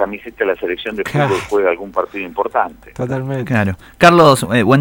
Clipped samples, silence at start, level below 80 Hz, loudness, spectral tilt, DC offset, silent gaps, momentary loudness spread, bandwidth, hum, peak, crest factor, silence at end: 0.3%; 0 s; -46 dBFS; -15 LUFS; -6 dB/octave; under 0.1%; none; 12 LU; over 20 kHz; none; 0 dBFS; 16 dB; 0 s